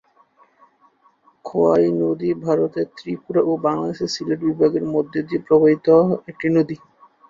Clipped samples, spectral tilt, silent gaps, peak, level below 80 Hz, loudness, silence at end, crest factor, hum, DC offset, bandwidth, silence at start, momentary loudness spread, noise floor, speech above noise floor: under 0.1%; -7 dB/octave; none; -4 dBFS; -60 dBFS; -19 LUFS; 0.55 s; 16 dB; none; under 0.1%; 7.6 kHz; 1.45 s; 11 LU; -57 dBFS; 39 dB